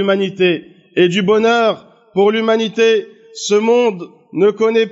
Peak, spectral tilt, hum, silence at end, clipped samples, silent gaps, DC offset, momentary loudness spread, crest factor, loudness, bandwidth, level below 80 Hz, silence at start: -2 dBFS; -3.5 dB/octave; none; 0 s; under 0.1%; none; under 0.1%; 11 LU; 12 dB; -15 LUFS; 8 kHz; -66 dBFS; 0 s